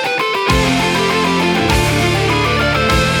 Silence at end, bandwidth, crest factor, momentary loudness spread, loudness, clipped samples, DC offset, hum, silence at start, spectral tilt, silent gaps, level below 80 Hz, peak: 0 s; 19 kHz; 14 dB; 1 LU; -14 LUFS; under 0.1%; under 0.1%; none; 0 s; -4.5 dB/octave; none; -26 dBFS; 0 dBFS